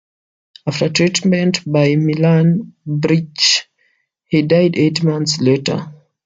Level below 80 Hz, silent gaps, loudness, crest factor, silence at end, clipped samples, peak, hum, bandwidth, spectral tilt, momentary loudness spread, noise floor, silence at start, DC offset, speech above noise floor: -58 dBFS; none; -15 LUFS; 14 dB; 0.3 s; under 0.1%; -2 dBFS; none; 9.2 kHz; -5 dB/octave; 9 LU; -62 dBFS; 0.65 s; under 0.1%; 48 dB